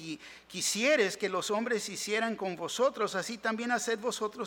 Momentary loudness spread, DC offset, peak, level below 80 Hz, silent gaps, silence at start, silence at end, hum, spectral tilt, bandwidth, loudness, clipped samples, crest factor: 9 LU; under 0.1%; -14 dBFS; -74 dBFS; none; 0 s; 0 s; none; -2.5 dB/octave; 18 kHz; -31 LUFS; under 0.1%; 18 dB